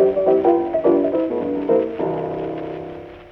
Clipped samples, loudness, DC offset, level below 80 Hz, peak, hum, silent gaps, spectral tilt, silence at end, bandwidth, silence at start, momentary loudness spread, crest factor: under 0.1%; -19 LUFS; under 0.1%; -52 dBFS; -4 dBFS; none; none; -10 dB/octave; 0 s; 4.5 kHz; 0 s; 14 LU; 14 dB